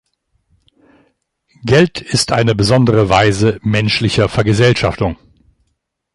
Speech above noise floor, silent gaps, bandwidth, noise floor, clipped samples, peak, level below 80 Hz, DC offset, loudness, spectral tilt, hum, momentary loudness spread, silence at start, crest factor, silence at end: 56 dB; none; 11.5 kHz; -69 dBFS; under 0.1%; 0 dBFS; -36 dBFS; under 0.1%; -13 LUFS; -5.5 dB/octave; none; 7 LU; 1.65 s; 14 dB; 1 s